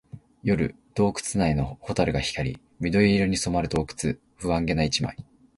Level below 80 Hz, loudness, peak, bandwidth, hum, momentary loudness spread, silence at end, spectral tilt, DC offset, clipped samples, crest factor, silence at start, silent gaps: -42 dBFS; -26 LUFS; -6 dBFS; 11.5 kHz; none; 10 LU; 0.35 s; -5.5 dB/octave; under 0.1%; under 0.1%; 20 dB; 0.15 s; none